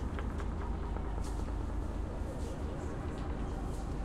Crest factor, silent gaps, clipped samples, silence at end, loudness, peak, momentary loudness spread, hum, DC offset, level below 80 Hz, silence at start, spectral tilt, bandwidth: 14 dB; none; under 0.1%; 0 s; -40 LUFS; -24 dBFS; 1 LU; none; under 0.1%; -40 dBFS; 0 s; -7 dB/octave; 12 kHz